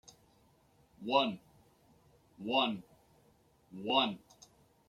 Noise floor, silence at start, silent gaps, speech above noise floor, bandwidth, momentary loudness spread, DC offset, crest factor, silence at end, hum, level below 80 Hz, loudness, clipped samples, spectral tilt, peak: -68 dBFS; 1 s; none; 35 dB; 15 kHz; 19 LU; under 0.1%; 24 dB; 0.7 s; none; -76 dBFS; -33 LUFS; under 0.1%; -4.5 dB/octave; -14 dBFS